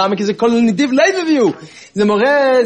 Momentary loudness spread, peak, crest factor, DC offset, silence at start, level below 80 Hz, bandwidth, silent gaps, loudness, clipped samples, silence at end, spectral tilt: 5 LU; -2 dBFS; 12 dB; under 0.1%; 0 s; -60 dBFS; 10 kHz; none; -13 LUFS; under 0.1%; 0 s; -5 dB/octave